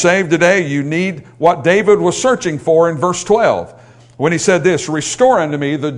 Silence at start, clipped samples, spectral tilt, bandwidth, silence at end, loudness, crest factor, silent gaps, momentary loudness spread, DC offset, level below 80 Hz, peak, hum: 0 s; under 0.1%; -4.5 dB/octave; 11 kHz; 0 s; -14 LUFS; 14 dB; none; 7 LU; under 0.1%; -52 dBFS; 0 dBFS; none